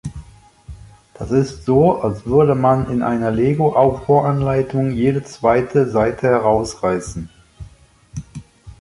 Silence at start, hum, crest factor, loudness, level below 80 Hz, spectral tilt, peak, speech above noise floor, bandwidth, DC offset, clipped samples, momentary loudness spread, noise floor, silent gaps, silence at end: 0.05 s; none; 16 dB; -17 LUFS; -40 dBFS; -7.5 dB/octave; -2 dBFS; 30 dB; 11.5 kHz; under 0.1%; under 0.1%; 19 LU; -46 dBFS; none; 0.1 s